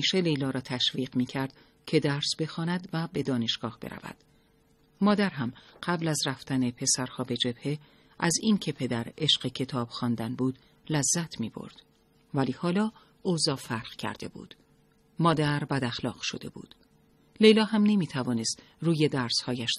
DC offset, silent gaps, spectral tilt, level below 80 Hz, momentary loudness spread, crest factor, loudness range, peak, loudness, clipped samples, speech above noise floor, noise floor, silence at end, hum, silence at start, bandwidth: under 0.1%; none; -4 dB/octave; -64 dBFS; 12 LU; 22 dB; 5 LU; -8 dBFS; -28 LUFS; under 0.1%; 36 dB; -64 dBFS; 0 s; none; 0 s; 13 kHz